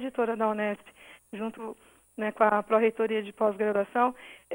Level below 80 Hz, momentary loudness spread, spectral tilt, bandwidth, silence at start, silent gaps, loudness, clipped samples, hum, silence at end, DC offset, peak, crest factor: -72 dBFS; 17 LU; -6.5 dB/octave; 16.5 kHz; 0 s; none; -28 LUFS; under 0.1%; none; 0 s; under 0.1%; -8 dBFS; 20 dB